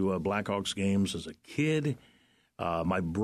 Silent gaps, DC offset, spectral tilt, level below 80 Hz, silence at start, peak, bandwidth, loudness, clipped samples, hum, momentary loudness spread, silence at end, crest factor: none; under 0.1%; -6 dB/octave; -56 dBFS; 0 s; -16 dBFS; 13 kHz; -31 LUFS; under 0.1%; none; 9 LU; 0 s; 16 dB